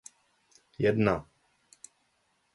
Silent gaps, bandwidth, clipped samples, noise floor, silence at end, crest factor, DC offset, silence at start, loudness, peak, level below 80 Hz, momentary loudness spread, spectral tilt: none; 11.5 kHz; under 0.1%; -73 dBFS; 1.3 s; 22 dB; under 0.1%; 0.8 s; -28 LUFS; -12 dBFS; -58 dBFS; 26 LU; -7 dB/octave